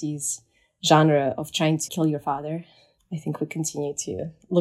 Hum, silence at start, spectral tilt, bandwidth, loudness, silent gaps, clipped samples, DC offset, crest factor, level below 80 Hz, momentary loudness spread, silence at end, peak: none; 0 s; -4.5 dB/octave; 15 kHz; -24 LUFS; none; under 0.1%; under 0.1%; 22 dB; -66 dBFS; 15 LU; 0 s; -4 dBFS